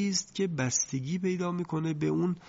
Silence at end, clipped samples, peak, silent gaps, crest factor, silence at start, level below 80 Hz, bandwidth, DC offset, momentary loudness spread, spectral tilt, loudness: 0 s; under 0.1%; -14 dBFS; none; 16 dB; 0 s; -64 dBFS; 7.8 kHz; under 0.1%; 4 LU; -4.5 dB/octave; -30 LUFS